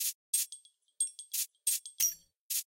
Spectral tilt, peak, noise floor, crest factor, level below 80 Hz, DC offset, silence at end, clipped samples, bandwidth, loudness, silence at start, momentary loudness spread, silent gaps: 5.5 dB/octave; -12 dBFS; -55 dBFS; 24 dB; -84 dBFS; under 0.1%; 0.05 s; under 0.1%; 17 kHz; -33 LUFS; 0 s; 7 LU; 0.15-0.33 s, 2.36-2.50 s